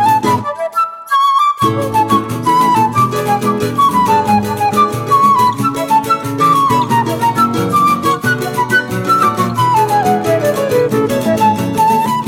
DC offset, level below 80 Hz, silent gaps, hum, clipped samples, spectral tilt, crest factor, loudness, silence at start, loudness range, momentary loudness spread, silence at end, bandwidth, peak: under 0.1%; -48 dBFS; none; none; under 0.1%; -5.5 dB/octave; 12 dB; -13 LUFS; 0 s; 1 LU; 4 LU; 0 s; 17 kHz; 0 dBFS